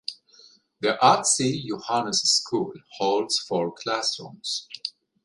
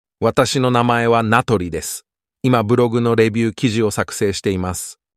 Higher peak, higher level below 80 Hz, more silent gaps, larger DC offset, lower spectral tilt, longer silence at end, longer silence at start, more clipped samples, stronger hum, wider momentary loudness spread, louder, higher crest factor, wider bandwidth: about the same, -2 dBFS vs -2 dBFS; second, -68 dBFS vs -48 dBFS; neither; neither; second, -2.5 dB/octave vs -5.5 dB/octave; about the same, 0.35 s vs 0.25 s; about the same, 0.1 s vs 0.2 s; neither; neither; first, 14 LU vs 9 LU; second, -24 LUFS vs -17 LUFS; first, 22 dB vs 16 dB; second, 11.5 kHz vs 15.5 kHz